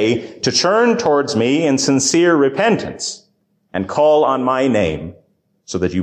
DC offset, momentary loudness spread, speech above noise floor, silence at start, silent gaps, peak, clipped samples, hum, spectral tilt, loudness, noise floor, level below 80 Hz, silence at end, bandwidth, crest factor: under 0.1%; 12 LU; 46 dB; 0 s; none; -4 dBFS; under 0.1%; none; -4 dB/octave; -15 LUFS; -62 dBFS; -46 dBFS; 0 s; 15 kHz; 12 dB